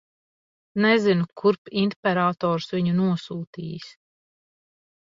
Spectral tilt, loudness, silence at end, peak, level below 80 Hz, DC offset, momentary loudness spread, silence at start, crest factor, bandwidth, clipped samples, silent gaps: -7.5 dB/octave; -23 LUFS; 1.1 s; -4 dBFS; -66 dBFS; under 0.1%; 15 LU; 0.75 s; 20 dB; 7.6 kHz; under 0.1%; 1.58-1.65 s, 1.96-2.03 s, 3.47-3.53 s